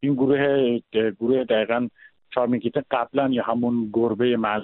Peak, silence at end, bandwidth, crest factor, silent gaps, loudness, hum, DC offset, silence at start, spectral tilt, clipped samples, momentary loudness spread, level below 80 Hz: -6 dBFS; 0 s; 4.1 kHz; 16 dB; none; -23 LUFS; none; under 0.1%; 0 s; -5 dB/octave; under 0.1%; 5 LU; -62 dBFS